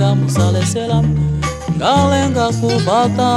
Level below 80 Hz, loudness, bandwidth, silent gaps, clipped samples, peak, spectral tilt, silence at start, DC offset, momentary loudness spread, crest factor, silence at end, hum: -32 dBFS; -15 LUFS; 13 kHz; none; under 0.1%; -2 dBFS; -6 dB/octave; 0 s; under 0.1%; 5 LU; 12 dB; 0 s; none